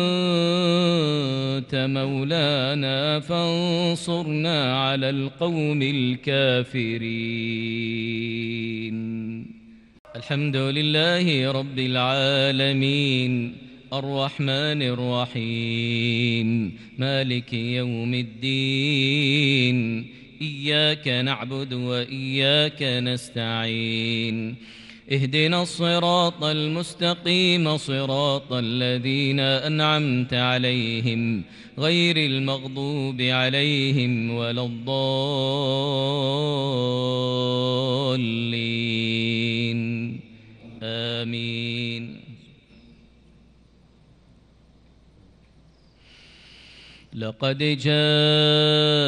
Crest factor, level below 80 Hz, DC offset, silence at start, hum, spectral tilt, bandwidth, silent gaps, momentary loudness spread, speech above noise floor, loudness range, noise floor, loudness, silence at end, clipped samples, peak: 18 dB; -62 dBFS; under 0.1%; 0 s; none; -6 dB/octave; 11.5 kHz; 9.99-10.05 s; 9 LU; 32 dB; 6 LU; -55 dBFS; -23 LUFS; 0 s; under 0.1%; -6 dBFS